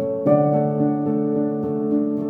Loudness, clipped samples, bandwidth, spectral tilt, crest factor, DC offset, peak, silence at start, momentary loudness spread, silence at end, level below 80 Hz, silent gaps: -20 LUFS; under 0.1%; 2.6 kHz; -12.5 dB/octave; 14 dB; under 0.1%; -4 dBFS; 0 s; 5 LU; 0 s; -64 dBFS; none